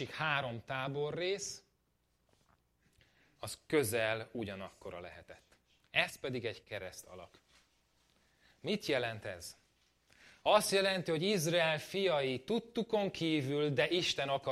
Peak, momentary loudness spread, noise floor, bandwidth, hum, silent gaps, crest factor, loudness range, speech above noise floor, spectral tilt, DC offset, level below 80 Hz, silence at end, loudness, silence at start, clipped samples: -14 dBFS; 17 LU; -77 dBFS; 15.5 kHz; none; none; 24 dB; 9 LU; 42 dB; -4 dB/octave; under 0.1%; -72 dBFS; 0 s; -35 LUFS; 0 s; under 0.1%